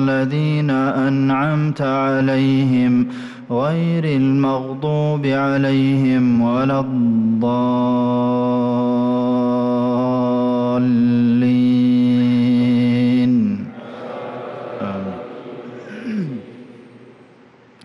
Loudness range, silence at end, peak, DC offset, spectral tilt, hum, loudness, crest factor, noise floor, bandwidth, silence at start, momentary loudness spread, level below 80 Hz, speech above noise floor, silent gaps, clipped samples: 9 LU; 0.85 s; -10 dBFS; under 0.1%; -9 dB/octave; none; -17 LUFS; 8 dB; -48 dBFS; 6.2 kHz; 0 s; 14 LU; -56 dBFS; 31 dB; none; under 0.1%